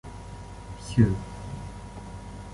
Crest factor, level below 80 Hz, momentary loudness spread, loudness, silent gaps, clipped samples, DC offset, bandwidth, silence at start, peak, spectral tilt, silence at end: 24 dB; -42 dBFS; 19 LU; -27 LUFS; none; under 0.1%; under 0.1%; 11.5 kHz; 0.05 s; -6 dBFS; -7.5 dB/octave; 0 s